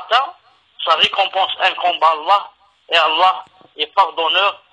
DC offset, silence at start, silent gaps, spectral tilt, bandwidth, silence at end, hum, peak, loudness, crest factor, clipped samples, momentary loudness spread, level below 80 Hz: under 0.1%; 0 s; none; -1 dB/octave; 10.5 kHz; 0.15 s; none; 0 dBFS; -15 LUFS; 16 dB; under 0.1%; 7 LU; -66 dBFS